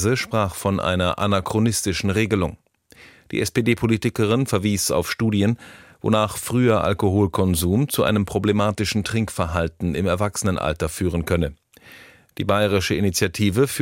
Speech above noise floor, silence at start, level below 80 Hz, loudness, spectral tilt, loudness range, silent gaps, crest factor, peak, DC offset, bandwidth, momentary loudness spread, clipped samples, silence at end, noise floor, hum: 29 dB; 0 s; -42 dBFS; -21 LUFS; -5 dB/octave; 3 LU; none; 16 dB; -4 dBFS; under 0.1%; 16.5 kHz; 4 LU; under 0.1%; 0 s; -50 dBFS; none